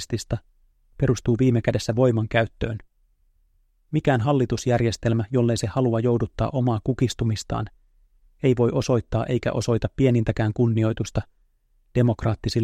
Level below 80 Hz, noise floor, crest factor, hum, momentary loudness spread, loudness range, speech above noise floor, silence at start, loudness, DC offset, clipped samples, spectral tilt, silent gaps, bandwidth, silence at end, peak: -42 dBFS; -63 dBFS; 16 dB; none; 8 LU; 2 LU; 41 dB; 0 s; -23 LUFS; under 0.1%; under 0.1%; -7 dB/octave; none; 10 kHz; 0 s; -6 dBFS